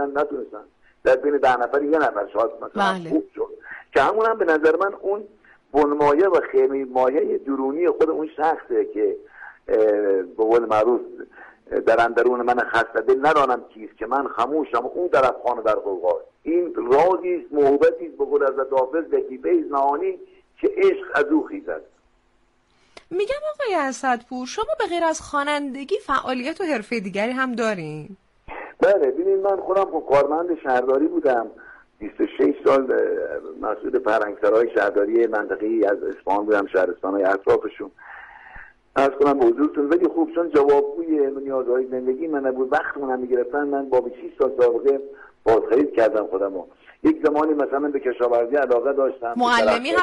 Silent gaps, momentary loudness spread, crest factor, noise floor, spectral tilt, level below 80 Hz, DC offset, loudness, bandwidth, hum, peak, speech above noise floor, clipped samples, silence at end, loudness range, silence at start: none; 10 LU; 12 dB; -62 dBFS; -5 dB/octave; -56 dBFS; under 0.1%; -21 LUFS; 11.5 kHz; none; -8 dBFS; 41 dB; under 0.1%; 0 s; 4 LU; 0 s